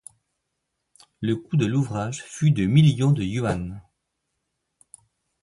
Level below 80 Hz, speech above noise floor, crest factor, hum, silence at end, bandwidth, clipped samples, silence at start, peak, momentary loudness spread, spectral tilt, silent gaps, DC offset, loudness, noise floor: -50 dBFS; 57 dB; 18 dB; none; 1.6 s; 11.5 kHz; under 0.1%; 1.2 s; -6 dBFS; 13 LU; -7 dB/octave; none; under 0.1%; -23 LUFS; -79 dBFS